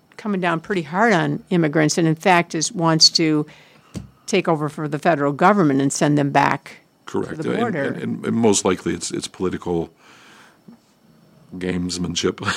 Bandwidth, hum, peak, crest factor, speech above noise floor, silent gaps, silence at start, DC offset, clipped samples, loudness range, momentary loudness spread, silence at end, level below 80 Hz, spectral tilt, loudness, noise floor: 15.5 kHz; none; 0 dBFS; 20 dB; 35 dB; none; 0.2 s; under 0.1%; under 0.1%; 9 LU; 11 LU; 0 s; -56 dBFS; -4 dB/octave; -19 LUFS; -54 dBFS